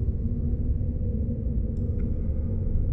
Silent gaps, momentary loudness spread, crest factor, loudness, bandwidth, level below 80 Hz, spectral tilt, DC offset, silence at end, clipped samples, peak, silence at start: none; 1 LU; 12 dB; -29 LUFS; 2.3 kHz; -28 dBFS; -13.5 dB/octave; under 0.1%; 0 s; under 0.1%; -14 dBFS; 0 s